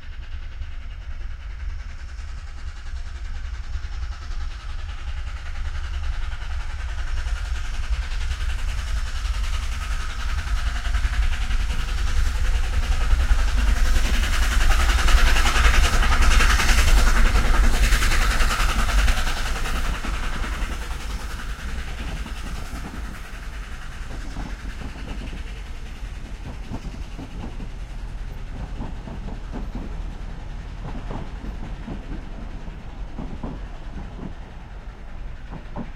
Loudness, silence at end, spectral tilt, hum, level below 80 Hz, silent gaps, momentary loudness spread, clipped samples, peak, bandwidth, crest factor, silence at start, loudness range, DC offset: -26 LUFS; 0 s; -3.5 dB/octave; none; -22 dBFS; none; 17 LU; under 0.1%; -2 dBFS; 15.5 kHz; 20 dB; 0 s; 16 LU; under 0.1%